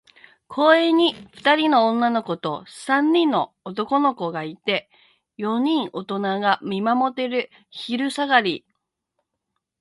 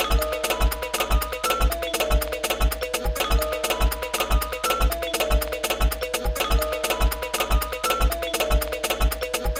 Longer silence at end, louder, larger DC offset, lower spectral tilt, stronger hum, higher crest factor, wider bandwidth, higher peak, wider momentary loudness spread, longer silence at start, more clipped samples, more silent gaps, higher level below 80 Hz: first, 1.25 s vs 0 s; first, -21 LUFS vs -24 LUFS; neither; first, -5 dB/octave vs -3.5 dB/octave; neither; about the same, 20 dB vs 16 dB; second, 11.5 kHz vs 17 kHz; first, -2 dBFS vs -8 dBFS; first, 12 LU vs 2 LU; first, 0.5 s vs 0 s; neither; neither; second, -72 dBFS vs -26 dBFS